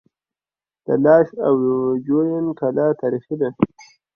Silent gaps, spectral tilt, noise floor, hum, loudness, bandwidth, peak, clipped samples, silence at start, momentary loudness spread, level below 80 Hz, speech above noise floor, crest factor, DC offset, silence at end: none; -9.5 dB/octave; under -90 dBFS; none; -19 LUFS; 6.6 kHz; -2 dBFS; under 0.1%; 0.9 s; 9 LU; -60 dBFS; over 72 dB; 18 dB; under 0.1%; 0.5 s